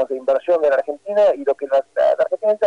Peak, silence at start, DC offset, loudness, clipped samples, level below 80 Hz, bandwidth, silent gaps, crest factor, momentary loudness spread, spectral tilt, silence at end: -8 dBFS; 0 s; under 0.1%; -18 LUFS; under 0.1%; -66 dBFS; 8 kHz; none; 10 dB; 4 LU; -5 dB/octave; 0 s